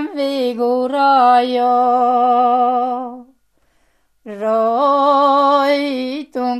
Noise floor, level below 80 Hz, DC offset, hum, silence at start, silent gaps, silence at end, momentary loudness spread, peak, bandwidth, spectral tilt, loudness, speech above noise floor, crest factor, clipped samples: -61 dBFS; -66 dBFS; under 0.1%; none; 0 s; none; 0 s; 11 LU; -2 dBFS; 12.5 kHz; -4.5 dB/octave; -15 LUFS; 47 dB; 14 dB; under 0.1%